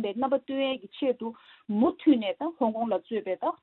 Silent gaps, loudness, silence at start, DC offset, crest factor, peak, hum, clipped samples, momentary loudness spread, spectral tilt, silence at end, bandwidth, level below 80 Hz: none; -28 LUFS; 0 s; under 0.1%; 16 dB; -10 dBFS; none; under 0.1%; 9 LU; -10 dB/octave; 0.1 s; 4.2 kHz; -70 dBFS